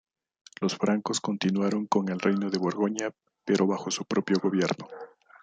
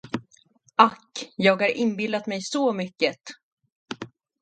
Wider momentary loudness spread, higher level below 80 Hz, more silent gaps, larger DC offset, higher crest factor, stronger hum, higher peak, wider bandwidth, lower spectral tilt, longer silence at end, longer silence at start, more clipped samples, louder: second, 10 LU vs 19 LU; about the same, -72 dBFS vs -70 dBFS; second, none vs 3.43-3.57 s, 3.72-3.86 s; neither; second, 18 dB vs 26 dB; neither; second, -10 dBFS vs 0 dBFS; about the same, 9.4 kHz vs 9.2 kHz; about the same, -5 dB/octave vs -4.5 dB/octave; about the same, 0.35 s vs 0.35 s; first, 0.6 s vs 0.05 s; neither; second, -28 LUFS vs -23 LUFS